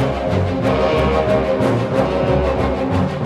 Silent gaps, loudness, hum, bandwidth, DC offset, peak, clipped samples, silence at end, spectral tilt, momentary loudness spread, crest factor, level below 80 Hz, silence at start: none; -17 LUFS; none; 12.5 kHz; under 0.1%; -4 dBFS; under 0.1%; 0 s; -7.5 dB/octave; 3 LU; 12 dB; -30 dBFS; 0 s